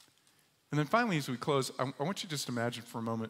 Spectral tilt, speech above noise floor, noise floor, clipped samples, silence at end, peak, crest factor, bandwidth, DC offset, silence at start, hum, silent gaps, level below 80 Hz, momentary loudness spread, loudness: -5 dB/octave; 35 dB; -69 dBFS; under 0.1%; 0 s; -14 dBFS; 20 dB; 16 kHz; under 0.1%; 0.7 s; none; none; -78 dBFS; 7 LU; -34 LUFS